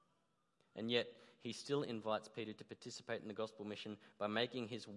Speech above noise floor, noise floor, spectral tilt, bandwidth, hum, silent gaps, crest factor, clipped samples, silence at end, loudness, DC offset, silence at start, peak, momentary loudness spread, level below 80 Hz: 38 dB; -82 dBFS; -4.5 dB/octave; 11.5 kHz; none; none; 24 dB; under 0.1%; 0 s; -44 LUFS; under 0.1%; 0.75 s; -22 dBFS; 12 LU; under -90 dBFS